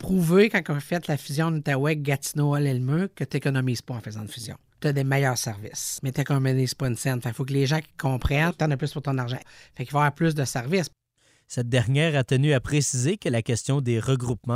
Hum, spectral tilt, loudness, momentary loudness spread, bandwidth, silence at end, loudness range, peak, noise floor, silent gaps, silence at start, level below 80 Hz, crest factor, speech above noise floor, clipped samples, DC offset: none; -5.5 dB/octave; -25 LUFS; 9 LU; 16 kHz; 0 s; 3 LU; -6 dBFS; -64 dBFS; none; 0 s; -46 dBFS; 18 dB; 40 dB; under 0.1%; under 0.1%